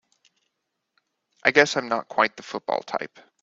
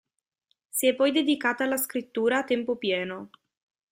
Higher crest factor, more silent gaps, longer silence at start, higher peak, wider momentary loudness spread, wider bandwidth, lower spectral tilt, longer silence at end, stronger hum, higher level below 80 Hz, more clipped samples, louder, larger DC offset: first, 26 dB vs 18 dB; neither; first, 1.45 s vs 0.75 s; first, 0 dBFS vs -10 dBFS; first, 13 LU vs 8 LU; second, 8 kHz vs 16 kHz; about the same, -3 dB/octave vs -3 dB/octave; second, 0.35 s vs 0.65 s; neither; about the same, -72 dBFS vs -74 dBFS; neither; first, -23 LUFS vs -26 LUFS; neither